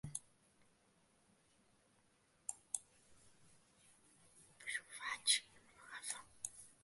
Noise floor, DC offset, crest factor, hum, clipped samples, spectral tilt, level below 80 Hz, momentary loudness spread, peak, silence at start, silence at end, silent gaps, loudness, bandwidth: -75 dBFS; under 0.1%; 32 dB; none; under 0.1%; 1 dB/octave; -80 dBFS; 16 LU; -18 dBFS; 0.05 s; 0.15 s; none; -43 LUFS; 11.5 kHz